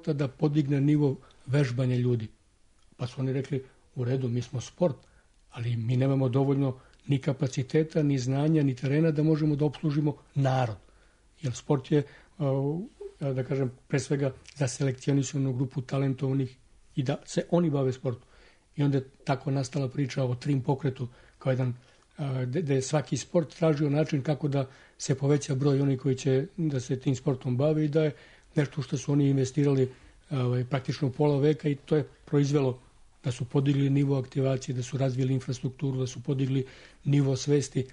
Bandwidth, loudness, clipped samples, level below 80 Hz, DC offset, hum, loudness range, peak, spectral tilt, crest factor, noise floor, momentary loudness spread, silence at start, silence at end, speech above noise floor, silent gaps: 10 kHz; -28 LUFS; under 0.1%; -60 dBFS; under 0.1%; none; 4 LU; -12 dBFS; -7 dB/octave; 16 dB; -61 dBFS; 10 LU; 0.05 s; 0 s; 34 dB; none